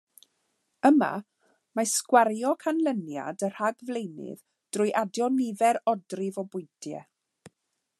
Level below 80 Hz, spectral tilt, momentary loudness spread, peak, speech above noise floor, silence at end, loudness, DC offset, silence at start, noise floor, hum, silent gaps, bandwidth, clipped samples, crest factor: -86 dBFS; -4 dB/octave; 17 LU; -6 dBFS; 53 dB; 0.5 s; -27 LUFS; under 0.1%; 0.85 s; -80 dBFS; none; none; 13 kHz; under 0.1%; 22 dB